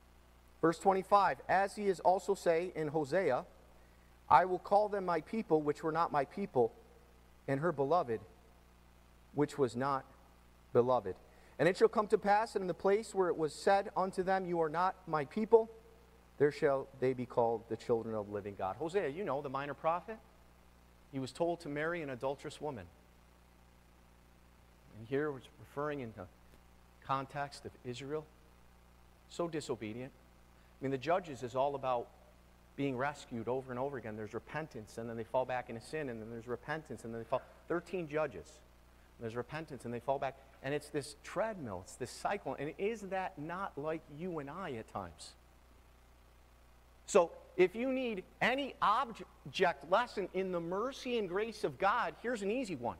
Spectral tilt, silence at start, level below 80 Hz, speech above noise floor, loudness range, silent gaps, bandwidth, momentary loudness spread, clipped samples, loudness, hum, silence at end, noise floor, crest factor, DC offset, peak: -5.5 dB/octave; 0.65 s; -64 dBFS; 27 dB; 11 LU; none; 15.5 kHz; 13 LU; under 0.1%; -36 LUFS; 60 Hz at -65 dBFS; 0 s; -63 dBFS; 26 dB; under 0.1%; -12 dBFS